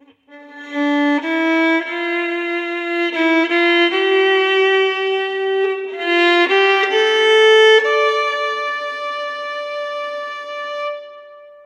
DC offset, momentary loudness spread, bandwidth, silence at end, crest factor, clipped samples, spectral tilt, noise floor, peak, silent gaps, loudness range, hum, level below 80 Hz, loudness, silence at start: under 0.1%; 13 LU; 9.8 kHz; 0.15 s; 14 dB; under 0.1%; -1 dB/octave; -43 dBFS; -2 dBFS; none; 6 LU; none; -82 dBFS; -16 LUFS; 0.3 s